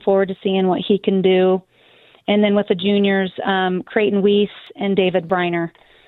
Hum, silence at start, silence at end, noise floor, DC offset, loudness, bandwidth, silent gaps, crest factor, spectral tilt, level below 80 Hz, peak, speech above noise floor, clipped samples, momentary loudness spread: none; 0.05 s; 0.4 s; -51 dBFS; under 0.1%; -18 LUFS; 4.1 kHz; none; 16 dB; -9.5 dB/octave; -60 dBFS; -2 dBFS; 34 dB; under 0.1%; 7 LU